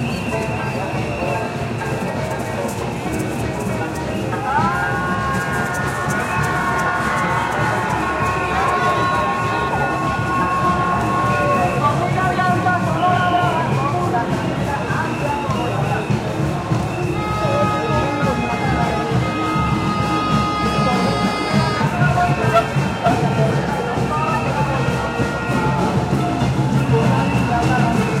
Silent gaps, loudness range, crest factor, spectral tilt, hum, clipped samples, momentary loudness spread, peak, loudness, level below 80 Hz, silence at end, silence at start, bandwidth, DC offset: none; 4 LU; 16 dB; -6 dB/octave; none; under 0.1%; 6 LU; -2 dBFS; -19 LUFS; -38 dBFS; 0 s; 0 s; 16 kHz; under 0.1%